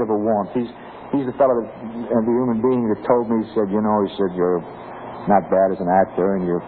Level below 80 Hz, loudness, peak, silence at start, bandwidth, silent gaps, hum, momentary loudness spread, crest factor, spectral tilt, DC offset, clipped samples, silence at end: -54 dBFS; -20 LUFS; -2 dBFS; 0 s; 4.5 kHz; none; none; 13 LU; 16 dB; -12 dB/octave; under 0.1%; under 0.1%; 0 s